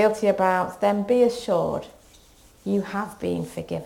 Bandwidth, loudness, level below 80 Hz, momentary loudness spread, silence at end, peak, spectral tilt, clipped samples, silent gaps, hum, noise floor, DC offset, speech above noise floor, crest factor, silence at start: 16.5 kHz; -24 LUFS; -56 dBFS; 10 LU; 0 s; -6 dBFS; -6 dB/octave; under 0.1%; none; none; -53 dBFS; under 0.1%; 30 dB; 18 dB; 0 s